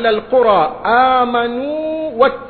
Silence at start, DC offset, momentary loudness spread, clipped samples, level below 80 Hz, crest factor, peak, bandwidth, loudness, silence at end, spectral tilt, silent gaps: 0 s; under 0.1%; 9 LU; under 0.1%; -46 dBFS; 14 dB; 0 dBFS; 4.5 kHz; -14 LUFS; 0 s; -8 dB/octave; none